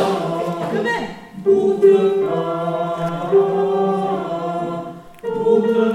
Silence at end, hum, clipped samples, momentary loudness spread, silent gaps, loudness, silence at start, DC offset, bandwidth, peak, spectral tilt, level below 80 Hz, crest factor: 0 s; none; under 0.1%; 12 LU; none; -18 LUFS; 0 s; under 0.1%; 11.5 kHz; -2 dBFS; -7 dB/octave; -56 dBFS; 16 dB